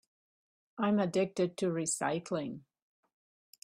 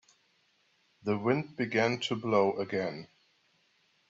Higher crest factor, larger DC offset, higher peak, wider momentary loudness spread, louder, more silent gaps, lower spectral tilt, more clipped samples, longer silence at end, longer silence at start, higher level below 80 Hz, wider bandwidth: about the same, 18 dB vs 20 dB; neither; second, -18 dBFS vs -14 dBFS; first, 13 LU vs 10 LU; about the same, -33 LUFS vs -31 LUFS; neither; about the same, -5 dB/octave vs -6 dB/octave; neither; about the same, 1.05 s vs 1.05 s; second, 0.75 s vs 1.05 s; about the same, -76 dBFS vs -74 dBFS; first, 15 kHz vs 8 kHz